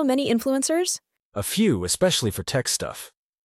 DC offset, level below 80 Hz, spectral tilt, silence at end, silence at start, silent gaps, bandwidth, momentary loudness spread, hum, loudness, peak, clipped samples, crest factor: under 0.1%; -52 dBFS; -4 dB/octave; 0.35 s; 0 s; 1.22-1.32 s; 16 kHz; 12 LU; none; -23 LUFS; -10 dBFS; under 0.1%; 14 dB